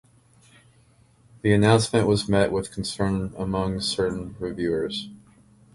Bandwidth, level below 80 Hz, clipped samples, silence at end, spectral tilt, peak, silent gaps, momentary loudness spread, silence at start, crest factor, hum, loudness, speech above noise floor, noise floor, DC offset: 11.5 kHz; -46 dBFS; under 0.1%; 0.6 s; -5.5 dB/octave; -4 dBFS; none; 12 LU; 1.45 s; 22 dB; none; -24 LUFS; 35 dB; -58 dBFS; under 0.1%